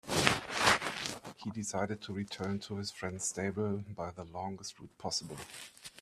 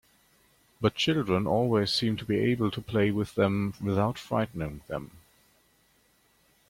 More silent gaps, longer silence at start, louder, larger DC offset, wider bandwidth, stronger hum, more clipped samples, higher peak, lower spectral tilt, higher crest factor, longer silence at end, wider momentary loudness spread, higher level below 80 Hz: neither; second, 0.05 s vs 0.8 s; second, -35 LUFS vs -28 LUFS; neither; second, 14.5 kHz vs 16.5 kHz; neither; neither; first, -2 dBFS vs -10 dBFS; second, -3 dB/octave vs -6.5 dB/octave; first, 34 dB vs 20 dB; second, 0 s vs 1.5 s; first, 16 LU vs 11 LU; second, -64 dBFS vs -56 dBFS